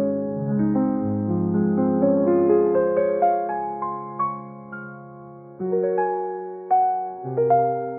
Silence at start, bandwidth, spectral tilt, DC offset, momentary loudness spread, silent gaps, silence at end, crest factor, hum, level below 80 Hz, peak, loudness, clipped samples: 0 s; 2.8 kHz; -11 dB/octave; under 0.1%; 17 LU; none; 0 s; 14 dB; none; -58 dBFS; -8 dBFS; -22 LUFS; under 0.1%